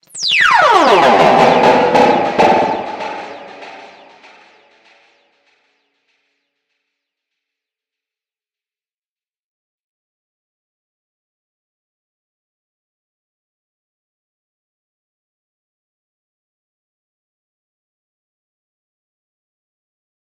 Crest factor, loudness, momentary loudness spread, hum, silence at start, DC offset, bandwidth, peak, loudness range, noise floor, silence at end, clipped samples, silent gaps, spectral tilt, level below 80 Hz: 18 dB; -10 LUFS; 23 LU; none; 0.15 s; under 0.1%; 15.5 kHz; 0 dBFS; 20 LU; under -90 dBFS; 16.4 s; under 0.1%; none; -4 dB/octave; -56 dBFS